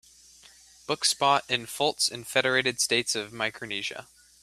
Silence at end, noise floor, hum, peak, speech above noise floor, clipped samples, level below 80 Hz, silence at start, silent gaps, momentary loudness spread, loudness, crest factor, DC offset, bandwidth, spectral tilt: 0.4 s; -54 dBFS; none; -6 dBFS; 27 dB; under 0.1%; -68 dBFS; 0.9 s; none; 10 LU; -26 LUFS; 22 dB; under 0.1%; 15.5 kHz; -1.5 dB/octave